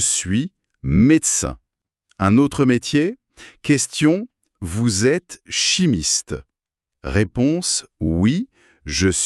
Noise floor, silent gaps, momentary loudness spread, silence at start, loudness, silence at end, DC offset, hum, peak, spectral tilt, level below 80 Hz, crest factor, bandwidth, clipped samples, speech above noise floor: -84 dBFS; none; 15 LU; 0 s; -19 LUFS; 0 s; under 0.1%; none; -4 dBFS; -4 dB/octave; -40 dBFS; 16 dB; 13 kHz; under 0.1%; 66 dB